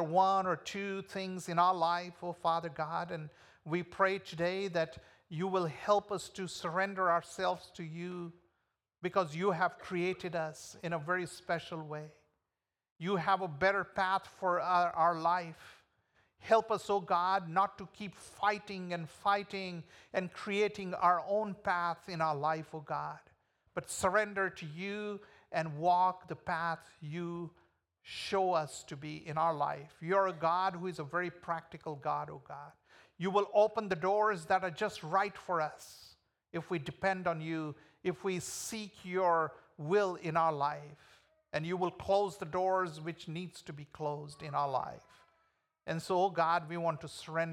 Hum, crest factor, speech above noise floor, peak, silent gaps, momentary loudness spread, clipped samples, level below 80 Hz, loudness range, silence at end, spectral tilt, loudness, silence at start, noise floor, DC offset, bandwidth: none; 20 dB; over 56 dB; -14 dBFS; 12.92-12.96 s; 14 LU; under 0.1%; -74 dBFS; 4 LU; 0 s; -5 dB/octave; -35 LUFS; 0 s; under -90 dBFS; under 0.1%; 16.5 kHz